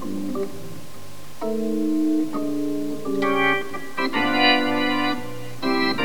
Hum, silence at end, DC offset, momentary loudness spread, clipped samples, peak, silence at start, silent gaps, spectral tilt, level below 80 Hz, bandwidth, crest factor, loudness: none; 0 s; 3%; 18 LU; under 0.1%; -4 dBFS; 0 s; none; -4.5 dB/octave; -58 dBFS; 19.5 kHz; 18 dB; -23 LUFS